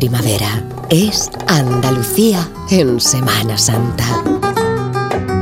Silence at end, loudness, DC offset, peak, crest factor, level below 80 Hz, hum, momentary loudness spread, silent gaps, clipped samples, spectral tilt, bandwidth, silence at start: 0 s; -14 LUFS; under 0.1%; 0 dBFS; 14 dB; -38 dBFS; none; 6 LU; none; under 0.1%; -4.5 dB/octave; 16.5 kHz; 0 s